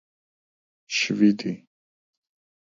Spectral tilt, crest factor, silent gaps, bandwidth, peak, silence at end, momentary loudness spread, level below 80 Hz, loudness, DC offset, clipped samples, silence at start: -4.5 dB/octave; 20 dB; none; 7.6 kHz; -8 dBFS; 1.05 s; 13 LU; -72 dBFS; -23 LUFS; under 0.1%; under 0.1%; 0.9 s